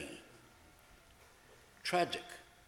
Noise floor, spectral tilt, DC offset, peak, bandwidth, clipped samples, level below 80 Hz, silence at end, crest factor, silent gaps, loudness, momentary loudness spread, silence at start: -62 dBFS; -3.5 dB/octave; under 0.1%; -18 dBFS; 17.5 kHz; under 0.1%; -70 dBFS; 0.25 s; 24 dB; none; -37 LUFS; 27 LU; 0 s